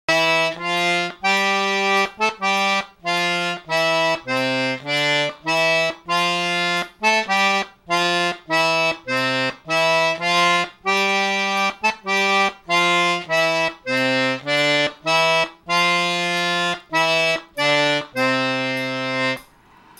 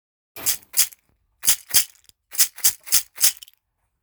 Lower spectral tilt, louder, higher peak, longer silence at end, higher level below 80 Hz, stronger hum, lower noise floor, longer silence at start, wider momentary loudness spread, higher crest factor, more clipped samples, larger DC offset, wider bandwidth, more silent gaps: first, -3 dB/octave vs 2.5 dB/octave; about the same, -19 LUFS vs -19 LUFS; second, -4 dBFS vs 0 dBFS; second, 0.55 s vs 0.7 s; second, -64 dBFS vs -58 dBFS; neither; second, -50 dBFS vs -68 dBFS; second, 0.1 s vs 0.35 s; second, 5 LU vs 9 LU; second, 16 dB vs 24 dB; neither; neither; about the same, 18.5 kHz vs over 20 kHz; neither